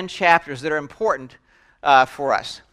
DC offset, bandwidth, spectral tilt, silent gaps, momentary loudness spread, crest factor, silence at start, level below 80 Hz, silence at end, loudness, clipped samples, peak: under 0.1%; 12.5 kHz; -4 dB/octave; none; 9 LU; 20 dB; 0 s; -58 dBFS; 0.15 s; -19 LUFS; under 0.1%; 0 dBFS